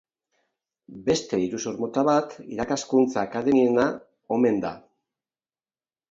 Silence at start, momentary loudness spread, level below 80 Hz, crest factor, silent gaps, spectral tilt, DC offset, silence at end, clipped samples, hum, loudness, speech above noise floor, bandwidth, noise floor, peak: 0.9 s; 11 LU; -62 dBFS; 18 dB; none; -5 dB/octave; under 0.1%; 1.3 s; under 0.1%; none; -24 LUFS; over 67 dB; 7.8 kHz; under -90 dBFS; -8 dBFS